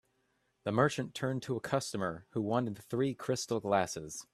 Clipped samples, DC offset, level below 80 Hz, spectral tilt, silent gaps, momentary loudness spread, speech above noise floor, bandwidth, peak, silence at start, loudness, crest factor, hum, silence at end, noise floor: under 0.1%; under 0.1%; -70 dBFS; -5 dB/octave; none; 7 LU; 43 dB; 14 kHz; -12 dBFS; 0.65 s; -34 LUFS; 22 dB; none; 0.1 s; -77 dBFS